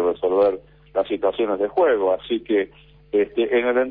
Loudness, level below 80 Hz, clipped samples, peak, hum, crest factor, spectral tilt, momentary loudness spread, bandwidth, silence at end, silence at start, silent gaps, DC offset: -21 LUFS; -54 dBFS; under 0.1%; -8 dBFS; none; 12 dB; -8.5 dB/octave; 7 LU; 4.7 kHz; 0 s; 0 s; none; under 0.1%